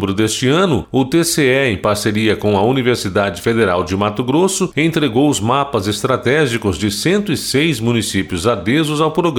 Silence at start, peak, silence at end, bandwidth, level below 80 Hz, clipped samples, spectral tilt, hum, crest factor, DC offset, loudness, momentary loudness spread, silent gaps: 0 s; -2 dBFS; 0 s; 18 kHz; -44 dBFS; under 0.1%; -5 dB/octave; none; 12 dB; under 0.1%; -15 LUFS; 4 LU; none